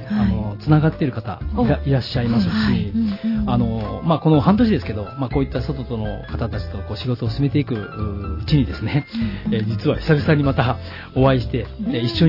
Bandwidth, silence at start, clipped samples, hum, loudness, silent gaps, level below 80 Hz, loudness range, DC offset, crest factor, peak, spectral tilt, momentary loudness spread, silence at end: 5.8 kHz; 0 s; under 0.1%; none; -20 LUFS; none; -34 dBFS; 4 LU; under 0.1%; 16 dB; -2 dBFS; -9 dB/octave; 10 LU; 0 s